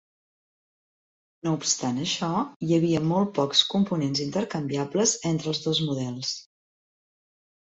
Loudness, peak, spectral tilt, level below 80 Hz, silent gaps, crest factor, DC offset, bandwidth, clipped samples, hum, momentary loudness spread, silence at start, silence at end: -25 LUFS; -6 dBFS; -4 dB/octave; -64 dBFS; 2.56-2.60 s; 22 dB; under 0.1%; 8.2 kHz; under 0.1%; none; 8 LU; 1.45 s; 1.25 s